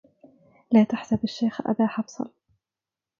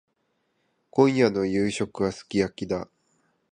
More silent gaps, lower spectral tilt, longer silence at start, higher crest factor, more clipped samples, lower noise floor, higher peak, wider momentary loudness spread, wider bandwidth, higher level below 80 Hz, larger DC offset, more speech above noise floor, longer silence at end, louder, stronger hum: neither; about the same, -7 dB/octave vs -6 dB/octave; second, 0.7 s vs 0.95 s; about the same, 20 dB vs 22 dB; neither; first, -90 dBFS vs -73 dBFS; about the same, -6 dBFS vs -4 dBFS; first, 14 LU vs 11 LU; second, 7.2 kHz vs 10 kHz; second, -62 dBFS vs -56 dBFS; neither; first, 66 dB vs 49 dB; first, 0.9 s vs 0.7 s; about the same, -24 LUFS vs -25 LUFS; neither